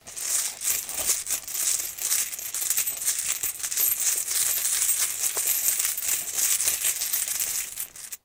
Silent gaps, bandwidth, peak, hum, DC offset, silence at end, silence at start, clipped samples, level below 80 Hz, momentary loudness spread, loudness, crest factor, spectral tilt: none; 19 kHz; -2 dBFS; none; under 0.1%; 0.1 s; 0.05 s; under 0.1%; -62 dBFS; 5 LU; -23 LUFS; 24 dB; 2.5 dB/octave